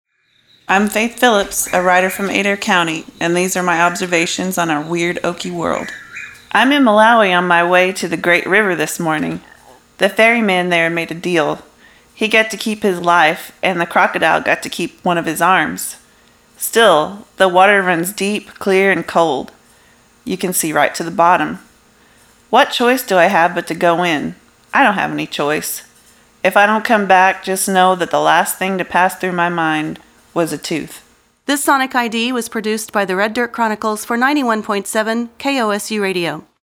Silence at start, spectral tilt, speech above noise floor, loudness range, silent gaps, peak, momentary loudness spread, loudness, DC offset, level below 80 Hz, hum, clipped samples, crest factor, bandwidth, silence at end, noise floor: 0.7 s; -3.5 dB/octave; 41 dB; 4 LU; none; 0 dBFS; 10 LU; -15 LUFS; under 0.1%; -56 dBFS; none; under 0.1%; 16 dB; over 20 kHz; 0.2 s; -56 dBFS